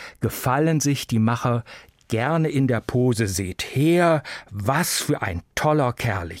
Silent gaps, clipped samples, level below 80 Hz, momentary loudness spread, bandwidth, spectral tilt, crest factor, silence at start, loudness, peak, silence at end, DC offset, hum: none; under 0.1%; -48 dBFS; 7 LU; 16.5 kHz; -5.5 dB/octave; 16 dB; 0 s; -22 LUFS; -6 dBFS; 0 s; under 0.1%; none